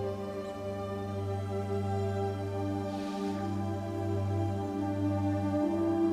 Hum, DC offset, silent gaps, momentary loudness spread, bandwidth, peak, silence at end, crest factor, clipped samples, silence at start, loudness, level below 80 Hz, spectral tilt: none; under 0.1%; none; 6 LU; 11.5 kHz; -20 dBFS; 0 s; 12 dB; under 0.1%; 0 s; -33 LUFS; -60 dBFS; -8 dB/octave